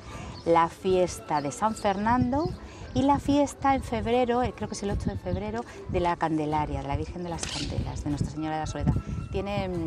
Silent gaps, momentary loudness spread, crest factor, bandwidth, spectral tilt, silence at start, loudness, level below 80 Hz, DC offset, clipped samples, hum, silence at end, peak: none; 9 LU; 18 dB; 14 kHz; -6 dB/octave; 0 s; -28 LUFS; -42 dBFS; under 0.1%; under 0.1%; none; 0 s; -10 dBFS